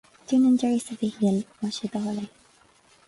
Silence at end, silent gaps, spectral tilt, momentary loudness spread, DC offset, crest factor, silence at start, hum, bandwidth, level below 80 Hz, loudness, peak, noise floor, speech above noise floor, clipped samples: 0.8 s; none; -6 dB/octave; 11 LU; under 0.1%; 14 dB; 0.3 s; none; 11.5 kHz; -66 dBFS; -25 LUFS; -12 dBFS; -59 dBFS; 34 dB; under 0.1%